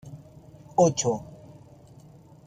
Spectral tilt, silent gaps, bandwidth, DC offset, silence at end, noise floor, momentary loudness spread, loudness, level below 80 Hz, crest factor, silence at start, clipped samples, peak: -5 dB/octave; none; 9.8 kHz; under 0.1%; 1.2 s; -51 dBFS; 25 LU; -25 LUFS; -60 dBFS; 22 dB; 0.05 s; under 0.1%; -8 dBFS